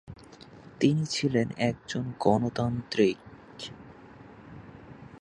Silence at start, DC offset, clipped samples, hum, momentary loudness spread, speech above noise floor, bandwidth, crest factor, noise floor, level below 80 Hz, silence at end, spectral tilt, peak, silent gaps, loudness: 0.1 s; under 0.1%; under 0.1%; none; 24 LU; 23 dB; 11.5 kHz; 22 dB; -50 dBFS; -58 dBFS; 0 s; -6 dB/octave; -8 dBFS; none; -28 LUFS